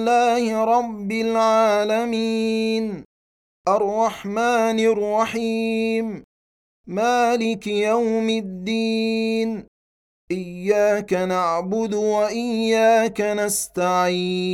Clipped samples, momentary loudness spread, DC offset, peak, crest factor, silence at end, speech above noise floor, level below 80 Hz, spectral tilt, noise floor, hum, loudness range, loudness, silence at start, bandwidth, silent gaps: under 0.1%; 8 LU; under 0.1%; -6 dBFS; 14 dB; 0 s; over 70 dB; -58 dBFS; -4.5 dB/octave; under -90 dBFS; none; 3 LU; -21 LUFS; 0 s; 16 kHz; 3.05-3.65 s, 6.24-6.84 s, 9.68-10.28 s